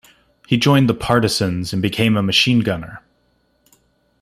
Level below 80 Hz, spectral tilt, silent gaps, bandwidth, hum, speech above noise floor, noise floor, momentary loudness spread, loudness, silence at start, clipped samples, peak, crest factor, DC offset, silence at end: -46 dBFS; -5 dB/octave; none; 15.5 kHz; none; 46 dB; -62 dBFS; 8 LU; -17 LUFS; 0.5 s; under 0.1%; -2 dBFS; 18 dB; under 0.1%; 1.25 s